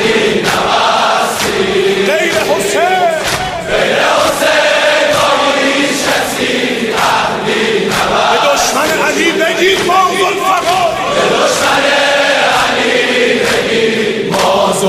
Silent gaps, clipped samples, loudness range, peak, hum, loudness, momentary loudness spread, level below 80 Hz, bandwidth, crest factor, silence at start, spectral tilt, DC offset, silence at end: none; under 0.1%; 1 LU; 0 dBFS; none; -11 LUFS; 3 LU; -42 dBFS; 16 kHz; 12 dB; 0 s; -2.5 dB/octave; under 0.1%; 0 s